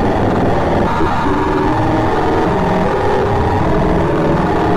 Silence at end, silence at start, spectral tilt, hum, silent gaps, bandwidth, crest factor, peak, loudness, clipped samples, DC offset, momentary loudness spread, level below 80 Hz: 0 s; 0 s; -7.5 dB/octave; none; none; 13 kHz; 10 dB; -4 dBFS; -14 LUFS; under 0.1%; under 0.1%; 1 LU; -26 dBFS